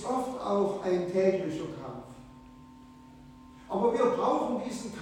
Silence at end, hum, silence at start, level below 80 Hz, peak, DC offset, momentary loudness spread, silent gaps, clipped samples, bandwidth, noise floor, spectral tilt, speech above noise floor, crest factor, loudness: 0 s; none; 0 s; -60 dBFS; -12 dBFS; under 0.1%; 16 LU; none; under 0.1%; 16 kHz; -52 dBFS; -6.5 dB/octave; 23 dB; 18 dB; -29 LUFS